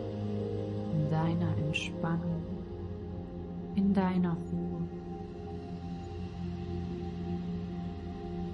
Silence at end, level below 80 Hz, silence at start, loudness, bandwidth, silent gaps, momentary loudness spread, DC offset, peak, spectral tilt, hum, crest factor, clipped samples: 0 s; -52 dBFS; 0 s; -35 LUFS; 9.6 kHz; none; 11 LU; under 0.1%; -16 dBFS; -8 dB/octave; none; 18 dB; under 0.1%